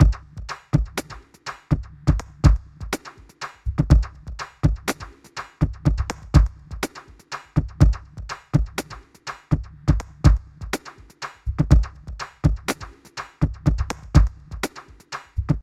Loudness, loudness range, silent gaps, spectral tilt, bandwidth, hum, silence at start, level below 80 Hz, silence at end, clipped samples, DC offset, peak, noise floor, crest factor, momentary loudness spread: -24 LUFS; 2 LU; none; -6.5 dB/octave; 14.5 kHz; none; 0 s; -26 dBFS; 0 s; under 0.1%; under 0.1%; 0 dBFS; -39 dBFS; 22 dB; 17 LU